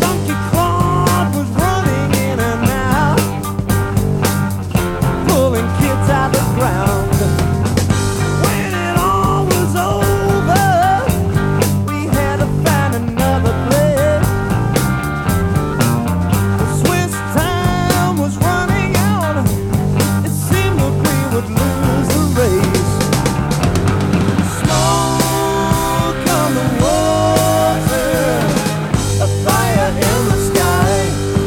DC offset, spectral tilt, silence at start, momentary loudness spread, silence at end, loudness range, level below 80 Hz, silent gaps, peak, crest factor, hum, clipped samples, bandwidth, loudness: under 0.1%; -5.5 dB/octave; 0 s; 3 LU; 0 s; 1 LU; -28 dBFS; none; 0 dBFS; 14 dB; none; under 0.1%; 18.5 kHz; -15 LUFS